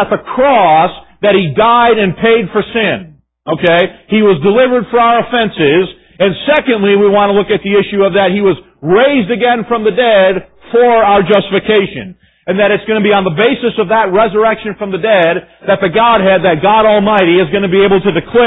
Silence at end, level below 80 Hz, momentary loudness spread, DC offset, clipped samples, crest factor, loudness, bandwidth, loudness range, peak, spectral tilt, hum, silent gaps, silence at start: 0 s; -44 dBFS; 7 LU; under 0.1%; under 0.1%; 10 dB; -10 LUFS; 4 kHz; 2 LU; 0 dBFS; -9 dB/octave; none; none; 0 s